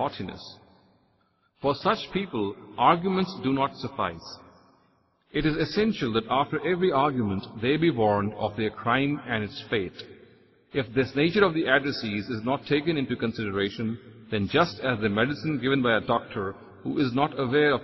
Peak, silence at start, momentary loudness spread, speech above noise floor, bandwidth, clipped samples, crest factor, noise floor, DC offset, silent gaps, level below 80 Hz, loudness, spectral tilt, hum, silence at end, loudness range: -6 dBFS; 0 s; 10 LU; 42 dB; 6.2 kHz; under 0.1%; 22 dB; -68 dBFS; under 0.1%; none; -54 dBFS; -26 LUFS; -7 dB/octave; none; 0 s; 3 LU